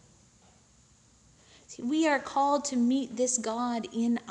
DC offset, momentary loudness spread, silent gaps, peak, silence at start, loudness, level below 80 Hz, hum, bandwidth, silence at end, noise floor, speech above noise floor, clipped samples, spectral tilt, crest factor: under 0.1%; 5 LU; none; -14 dBFS; 1.7 s; -29 LUFS; -68 dBFS; none; 10.5 kHz; 0 s; -61 dBFS; 33 dB; under 0.1%; -3 dB/octave; 16 dB